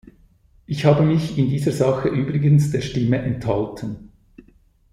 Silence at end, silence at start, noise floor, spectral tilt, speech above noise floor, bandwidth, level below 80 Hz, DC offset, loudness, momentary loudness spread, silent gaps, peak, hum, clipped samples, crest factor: 0.85 s; 0.7 s; -55 dBFS; -8 dB/octave; 36 dB; 12 kHz; -46 dBFS; under 0.1%; -20 LUFS; 13 LU; none; -2 dBFS; none; under 0.1%; 18 dB